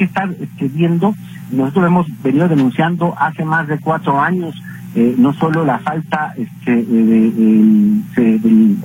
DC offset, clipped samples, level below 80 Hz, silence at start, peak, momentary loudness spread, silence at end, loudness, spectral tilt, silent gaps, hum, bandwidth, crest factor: under 0.1%; under 0.1%; -54 dBFS; 0 s; -2 dBFS; 11 LU; 0 s; -14 LUFS; -8.5 dB/octave; none; none; 15.5 kHz; 12 dB